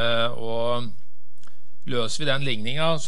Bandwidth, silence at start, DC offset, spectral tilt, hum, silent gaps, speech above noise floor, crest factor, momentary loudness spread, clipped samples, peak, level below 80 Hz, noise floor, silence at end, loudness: 11.5 kHz; 0 s; 10%; -4.5 dB/octave; none; none; 34 dB; 18 dB; 6 LU; under 0.1%; -6 dBFS; -64 dBFS; -60 dBFS; 0 s; -26 LUFS